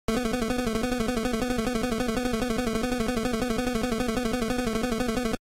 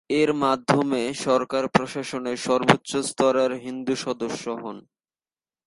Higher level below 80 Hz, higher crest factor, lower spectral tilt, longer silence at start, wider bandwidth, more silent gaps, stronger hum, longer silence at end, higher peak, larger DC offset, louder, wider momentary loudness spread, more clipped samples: first, -38 dBFS vs -62 dBFS; second, 12 dB vs 24 dB; about the same, -4.5 dB/octave vs -4.5 dB/octave; about the same, 0.1 s vs 0.1 s; first, 16 kHz vs 11.5 kHz; neither; neither; second, 0.05 s vs 0.85 s; second, -14 dBFS vs 0 dBFS; neither; second, -28 LUFS vs -24 LUFS; second, 0 LU vs 10 LU; neither